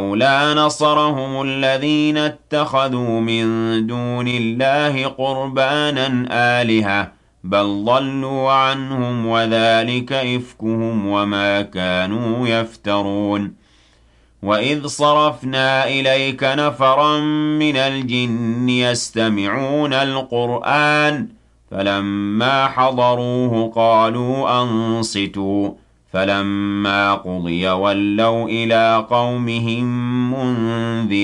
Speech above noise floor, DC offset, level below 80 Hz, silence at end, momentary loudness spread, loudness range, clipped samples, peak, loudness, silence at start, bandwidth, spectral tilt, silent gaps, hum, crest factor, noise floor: 35 dB; under 0.1%; -56 dBFS; 0 s; 6 LU; 3 LU; under 0.1%; -4 dBFS; -17 LUFS; 0 s; 11.5 kHz; -5.5 dB/octave; none; none; 14 dB; -53 dBFS